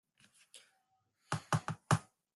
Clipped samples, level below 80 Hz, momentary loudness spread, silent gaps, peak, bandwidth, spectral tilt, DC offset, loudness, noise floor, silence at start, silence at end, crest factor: under 0.1%; -68 dBFS; 24 LU; none; -14 dBFS; 12 kHz; -5 dB/octave; under 0.1%; -37 LUFS; -79 dBFS; 0.55 s; 0.35 s; 26 dB